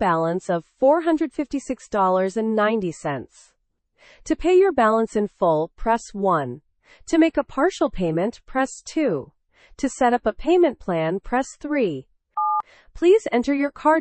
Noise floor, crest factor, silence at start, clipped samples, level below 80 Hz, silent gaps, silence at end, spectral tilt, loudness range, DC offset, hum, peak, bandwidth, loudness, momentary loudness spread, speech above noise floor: -66 dBFS; 16 dB; 0 s; under 0.1%; -46 dBFS; none; 0 s; -6 dB/octave; 2 LU; under 0.1%; none; -6 dBFS; 8.8 kHz; -22 LUFS; 10 LU; 45 dB